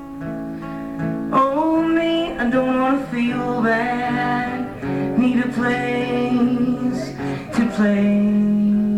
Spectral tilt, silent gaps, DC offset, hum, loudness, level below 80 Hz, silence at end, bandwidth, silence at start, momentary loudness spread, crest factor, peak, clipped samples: -7 dB/octave; none; 0.2%; none; -20 LUFS; -46 dBFS; 0 s; 10.5 kHz; 0 s; 9 LU; 14 dB; -4 dBFS; under 0.1%